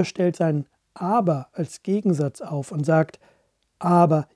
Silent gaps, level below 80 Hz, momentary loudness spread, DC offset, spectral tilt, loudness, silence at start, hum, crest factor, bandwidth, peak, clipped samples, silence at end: none; -72 dBFS; 12 LU; under 0.1%; -8 dB/octave; -23 LUFS; 0 s; none; 20 dB; 11 kHz; -4 dBFS; under 0.1%; 0.1 s